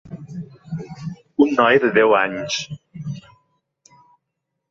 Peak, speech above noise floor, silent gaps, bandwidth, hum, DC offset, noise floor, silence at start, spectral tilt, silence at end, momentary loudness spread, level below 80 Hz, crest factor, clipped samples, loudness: -2 dBFS; 61 dB; none; 7.6 kHz; none; under 0.1%; -78 dBFS; 0.05 s; -5 dB/octave; 1.5 s; 20 LU; -60 dBFS; 20 dB; under 0.1%; -17 LUFS